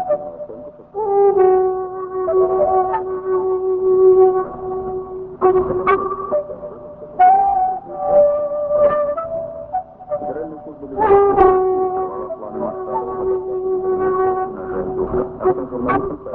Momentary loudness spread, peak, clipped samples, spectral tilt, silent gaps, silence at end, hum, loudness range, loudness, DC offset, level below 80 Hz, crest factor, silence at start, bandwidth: 15 LU; 0 dBFS; under 0.1%; -11 dB/octave; none; 0 s; none; 4 LU; -17 LUFS; under 0.1%; -44 dBFS; 18 dB; 0 s; 3.6 kHz